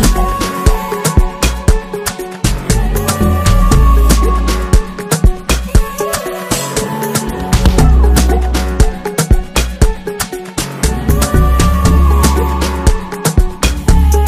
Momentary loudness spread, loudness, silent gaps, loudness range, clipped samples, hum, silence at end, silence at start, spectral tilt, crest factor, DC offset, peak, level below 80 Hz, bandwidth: 7 LU; -13 LUFS; none; 2 LU; under 0.1%; none; 0 s; 0 s; -5 dB/octave; 10 dB; under 0.1%; 0 dBFS; -12 dBFS; 16 kHz